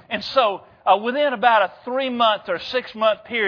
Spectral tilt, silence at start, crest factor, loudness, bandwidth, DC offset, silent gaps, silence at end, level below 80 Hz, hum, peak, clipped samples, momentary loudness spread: -4.5 dB/octave; 0.1 s; 18 dB; -20 LUFS; 5.4 kHz; under 0.1%; none; 0 s; -64 dBFS; none; -2 dBFS; under 0.1%; 7 LU